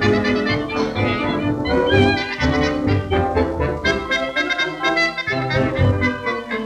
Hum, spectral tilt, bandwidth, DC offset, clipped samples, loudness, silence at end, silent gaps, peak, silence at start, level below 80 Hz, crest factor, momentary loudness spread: none; -6 dB/octave; 10 kHz; under 0.1%; under 0.1%; -19 LUFS; 0 s; none; -2 dBFS; 0 s; -36 dBFS; 16 dB; 4 LU